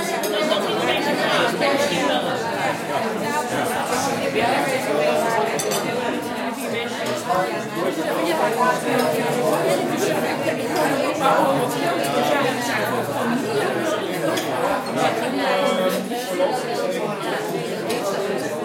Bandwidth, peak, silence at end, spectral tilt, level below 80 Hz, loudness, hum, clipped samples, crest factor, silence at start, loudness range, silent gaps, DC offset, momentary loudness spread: 16.5 kHz; -6 dBFS; 0 s; -4 dB/octave; -64 dBFS; -21 LUFS; none; under 0.1%; 16 dB; 0 s; 2 LU; none; under 0.1%; 5 LU